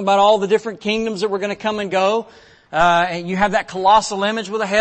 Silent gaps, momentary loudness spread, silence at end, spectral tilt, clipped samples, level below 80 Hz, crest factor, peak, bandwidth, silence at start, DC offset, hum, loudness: none; 8 LU; 0 s; -4 dB/octave; under 0.1%; -48 dBFS; 14 dB; -2 dBFS; 8.8 kHz; 0 s; under 0.1%; none; -18 LUFS